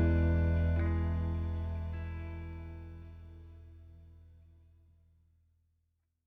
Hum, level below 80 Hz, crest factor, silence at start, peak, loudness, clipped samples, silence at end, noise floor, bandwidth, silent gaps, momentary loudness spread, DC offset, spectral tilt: 60 Hz at -65 dBFS; -40 dBFS; 16 dB; 0 s; -18 dBFS; -34 LUFS; under 0.1%; 2.05 s; -79 dBFS; 3.7 kHz; none; 24 LU; under 0.1%; -10.5 dB/octave